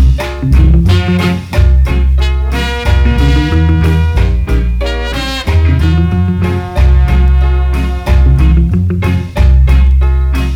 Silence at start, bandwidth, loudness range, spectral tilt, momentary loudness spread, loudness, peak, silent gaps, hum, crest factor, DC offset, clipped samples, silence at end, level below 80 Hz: 0 s; 8 kHz; 2 LU; -7 dB/octave; 6 LU; -11 LUFS; 0 dBFS; none; none; 8 dB; under 0.1%; 0.3%; 0 s; -10 dBFS